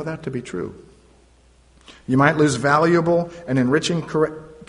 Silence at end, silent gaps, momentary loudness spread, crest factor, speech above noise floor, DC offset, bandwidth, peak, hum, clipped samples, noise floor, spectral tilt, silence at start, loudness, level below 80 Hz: 0.05 s; none; 14 LU; 18 dB; 34 dB; under 0.1%; 10.5 kHz; -2 dBFS; none; under 0.1%; -54 dBFS; -6 dB/octave; 0 s; -20 LUFS; -52 dBFS